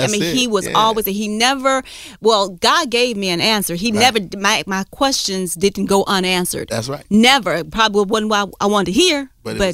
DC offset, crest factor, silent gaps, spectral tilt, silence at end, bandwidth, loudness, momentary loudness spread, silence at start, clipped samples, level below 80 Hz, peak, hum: under 0.1%; 16 dB; none; -3 dB/octave; 0 s; 16 kHz; -16 LUFS; 7 LU; 0 s; under 0.1%; -44 dBFS; 0 dBFS; none